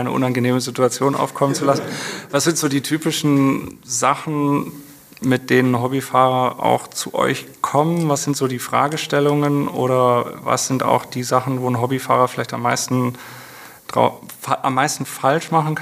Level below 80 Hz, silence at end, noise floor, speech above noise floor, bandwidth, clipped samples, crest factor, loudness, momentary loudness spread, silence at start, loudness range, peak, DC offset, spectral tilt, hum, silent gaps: -62 dBFS; 0 s; -40 dBFS; 21 dB; 15.5 kHz; under 0.1%; 18 dB; -19 LUFS; 8 LU; 0 s; 2 LU; 0 dBFS; under 0.1%; -5 dB/octave; none; none